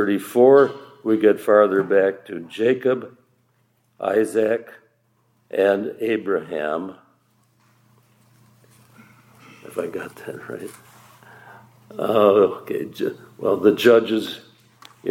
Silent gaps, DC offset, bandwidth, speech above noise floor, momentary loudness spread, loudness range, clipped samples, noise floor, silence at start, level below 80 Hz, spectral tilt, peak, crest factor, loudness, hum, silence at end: none; under 0.1%; 16.5 kHz; 45 dB; 18 LU; 16 LU; under 0.1%; -64 dBFS; 0 s; -76 dBFS; -6 dB/octave; -2 dBFS; 20 dB; -20 LUFS; none; 0 s